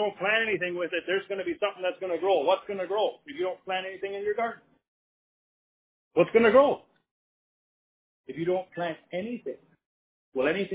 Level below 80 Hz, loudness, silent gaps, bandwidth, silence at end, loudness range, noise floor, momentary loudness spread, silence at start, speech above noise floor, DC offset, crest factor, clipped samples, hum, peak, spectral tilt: -70 dBFS; -28 LUFS; 4.88-6.11 s, 7.11-8.24 s, 9.86-10.32 s; 4 kHz; 0 s; 8 LU; under -90 dBFS; 14 LU; 0 s; over 63 dB; under 0.1%; 22 dB; under 0.1%; none; -8 dBFS; -8.5 dB/octave